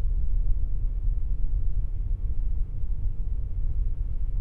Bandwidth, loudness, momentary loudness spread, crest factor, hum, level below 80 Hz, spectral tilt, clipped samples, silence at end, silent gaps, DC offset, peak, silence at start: 1 kHz; -33 LUFS; 3 LU; 12 dB; none; -26 dBFS; -11 dB/octave; under 0.1%; 0 s; none; under 0.1%; -10 dBFS; 0 s